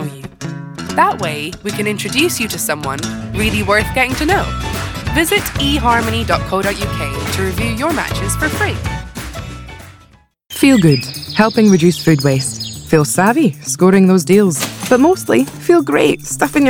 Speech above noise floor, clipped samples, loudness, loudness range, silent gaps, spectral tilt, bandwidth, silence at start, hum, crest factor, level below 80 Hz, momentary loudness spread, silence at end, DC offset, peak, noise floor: 34 dB; under 0.1%; -14 LUFS; 6 LU; none; -5 dB/octave; 19 kHz; 0 s; none; 14 dB; -32 dBFS; 13 LU; 0 s; under 0.1%; 0 dBFS; -48 dBFS